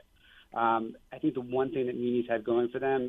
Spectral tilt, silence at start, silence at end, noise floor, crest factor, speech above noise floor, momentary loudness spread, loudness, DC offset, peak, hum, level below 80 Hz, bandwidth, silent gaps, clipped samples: -8.5 dB/octave; 0.55 s; 0 s; -60 dBFS; 18 dB; 30 dB; 5 LU; -31 LUFS; under 0.1%; -14 dBFS; none; -66 dBFS; 3.9 kHz; none; under 0.1%